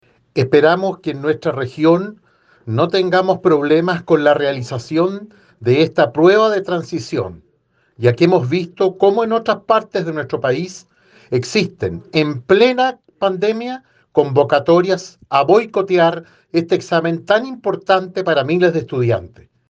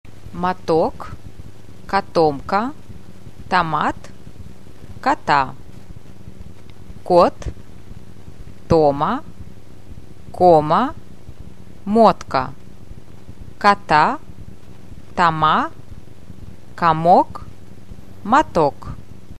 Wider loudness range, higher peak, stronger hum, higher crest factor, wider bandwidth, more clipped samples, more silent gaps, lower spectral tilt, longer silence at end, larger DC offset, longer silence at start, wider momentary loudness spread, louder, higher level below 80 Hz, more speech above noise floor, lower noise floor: about the same, 2 LU vs 4 LU; about the same, 0 dBFS vs 0 dBFS; neither; about the same, 16 dB vs 20 dB; second, 8 kHz vs 13.5 kHz; neither; neither; about the same, -6.5 dB/octave vs -6.5 dB/octave; first, 0.4 s vs 0.05 s; second, under 0.1% vs 3%; about the same, 0.35 s vs 0.25 s; second, 9 LU vs 22 LU; about the same, -16 LUFS vs -17 LUFS; second, -60 dBFS vs -42 dBFS; first, 45 dB vs 24 dB; first, -61 dBFS vs -40 dBFS